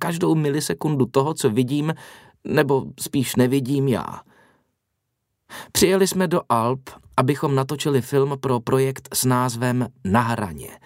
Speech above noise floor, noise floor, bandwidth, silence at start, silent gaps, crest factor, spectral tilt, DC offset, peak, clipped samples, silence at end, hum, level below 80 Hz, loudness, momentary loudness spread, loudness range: 56 dB; -77 dBFS; 16 kHz; 0 s; none; 18 dB; -5.5 dB/octave; under 0.1%; -2 dBFS; under 0.1%; 0.1 s; none; -54 dBFS; -21 LUFS; 7 LU; 3 LU